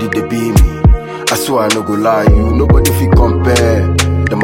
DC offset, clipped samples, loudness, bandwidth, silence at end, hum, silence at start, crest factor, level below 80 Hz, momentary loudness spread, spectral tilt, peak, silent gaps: under 0.1%; under 0.1%; -11 LUFS; 17 kHz; 0 s; none; 0 s; 10 dB; -16 dBFS; 5 LU; -5.5 dB/octave; 0 dBFS; none